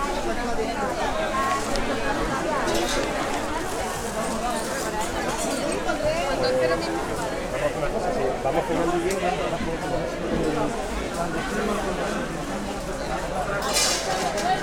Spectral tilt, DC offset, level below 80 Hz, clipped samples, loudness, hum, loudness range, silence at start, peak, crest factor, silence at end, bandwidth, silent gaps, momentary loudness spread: -3.5 dB/octave; under 0.1%; -38 dBFS; under 0.1%; -25 LUFS; none; 2 LU; 0 s; -8 dBFS; 18 dB; 0 s; 19 kHz; none; 5 LU